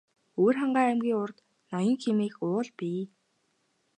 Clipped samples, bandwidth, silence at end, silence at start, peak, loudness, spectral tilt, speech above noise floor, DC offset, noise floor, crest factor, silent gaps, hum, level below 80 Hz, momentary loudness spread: under 0.1%; 9.6 kHz; 0.9 s; 0.35 s; -12 dBFS; -28 LUFS; -7 dB/octave; 46 dB; under 0.1%; -73 dBFS; 18 dB; none; none; -84 dBFS; 12 LU